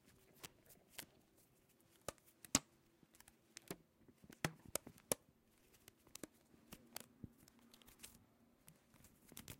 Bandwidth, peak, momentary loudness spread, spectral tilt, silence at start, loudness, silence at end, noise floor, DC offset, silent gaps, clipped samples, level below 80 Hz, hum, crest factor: 16.5 kHz; -14 dBFS; 24 LU; -2.5 dB/octave; 0.05 s; -48 LUFS; 0.05 s; -74 dBFS; under 0.1%; none; under 0.1%; -74 dBFS; none; 38 dB